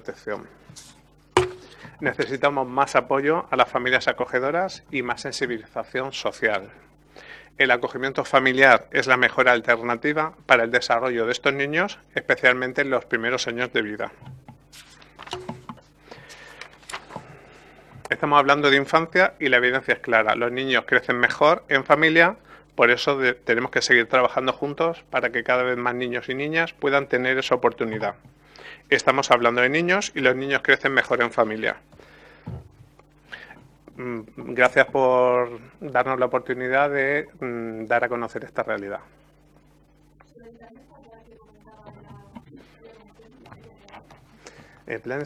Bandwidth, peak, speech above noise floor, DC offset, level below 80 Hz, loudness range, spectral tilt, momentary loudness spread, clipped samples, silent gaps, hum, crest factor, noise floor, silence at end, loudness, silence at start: 13 kHz; 0 dBFS; 34 dB; under 0.1%; -60 dBFS; 11 LU; -4 dB/octave; 17 LU; under 0.1%; none; none; 24 dB; -56 dBFS; 0 s; -21 LUFS; 0.05 s